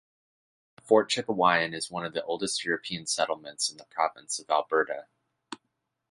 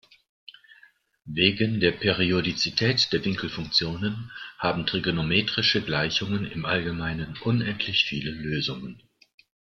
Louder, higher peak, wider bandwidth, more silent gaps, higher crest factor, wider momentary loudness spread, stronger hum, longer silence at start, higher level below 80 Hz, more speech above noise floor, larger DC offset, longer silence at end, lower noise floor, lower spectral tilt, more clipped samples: second, -28 LUFS vs -25 LUFS; second, -8 dBFS vs -4 dBFS; first, 11.5 kHz vs 7.4 kHz; neither; about the same, 22 dB vs 24 dB; first, 13 LU vs 9 LU; neither; second, 0.85 s vs 1.25 s; second, -72 dBFS vs -54 dBFS; first, 53 dB vs 33 dB; neither; second, 0.55 s vs 0.8 s; first, -81 dBFS vs -58 dBFS; second, -2.5 dB/octave vs -5 dB/octave; neither